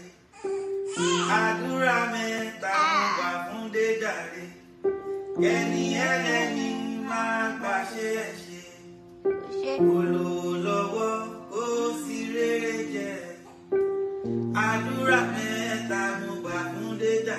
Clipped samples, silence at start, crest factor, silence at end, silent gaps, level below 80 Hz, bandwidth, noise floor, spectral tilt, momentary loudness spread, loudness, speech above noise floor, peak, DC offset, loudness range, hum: under 0.1%; 0 s; 18 dB; 0 s; none; -68 dBFS; 13 kHz; -47 dBFS; -4.5 dB/octave; 10 LU; -27 LUFS; 22 dB; -10 dBFS; under 0.1%; 4 LU; none